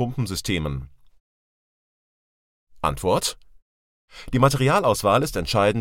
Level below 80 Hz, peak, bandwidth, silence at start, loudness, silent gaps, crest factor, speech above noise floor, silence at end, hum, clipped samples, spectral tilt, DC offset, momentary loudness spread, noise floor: -42 dBFS; -4 dBFS; 17 kHz; 0 s; -22 LUFS; 1.20-2.67 s, 3.62-4.08 s; 20 dB; over 68 dB; 0 s; none; under 0.1%; -5 dB/octave; under 0.1%; 9 LU; under -90 dBFS